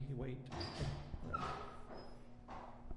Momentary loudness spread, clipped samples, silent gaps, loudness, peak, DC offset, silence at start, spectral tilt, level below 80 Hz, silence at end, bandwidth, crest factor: 11 LU; under 0.1%; none; -47 LUFS; -30 dBFS; under 0.1%; 0 s; -6 dB/octave; -54 dBFS; 0 s; 11 kHz; 16 dB